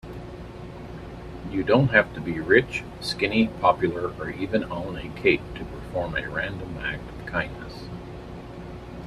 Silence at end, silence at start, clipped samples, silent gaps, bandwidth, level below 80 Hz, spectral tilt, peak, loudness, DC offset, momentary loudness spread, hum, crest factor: 0 s; 0.05 s; under 0.1%; none; 13.5 kHz; -44 dBFS; -6.5 dB/octave; -4 dBFS; -25 LUFS; under 0.1%; 19 LU; none; 22 dB